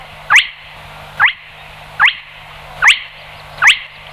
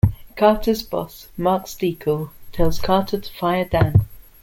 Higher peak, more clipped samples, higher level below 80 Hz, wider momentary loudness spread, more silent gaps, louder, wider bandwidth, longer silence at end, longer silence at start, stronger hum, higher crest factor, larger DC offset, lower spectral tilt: about the same, -2 dBFS vs -2 dBFS; neither; second, -46 dBFS vs -34 dBFS; first, 23 LU vs 10 LU; neither; first, -11 LUFS vs -21 LUFS; about the same, 16 kHz vs 17 kHz; about the same, 0.25 s vs 0.2 s; about the same, 0 s vs 0.05 s; first, 50 Hz at -45 dBFS vs none; about the same, 14 dB vs 18 dB; neither; second, 1 dB/octave vs -7 dB/octave